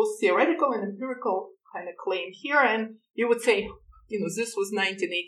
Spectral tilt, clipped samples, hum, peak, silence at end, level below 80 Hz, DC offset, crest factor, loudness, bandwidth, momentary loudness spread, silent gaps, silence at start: -3.5 dB/octave; under 0.1%; none; -8 dBFS; 0 s; -62 dBFS; under 0.1%; 20 dB; -26 LUFS; 13.5 kHz; 14 LU; none; 0 s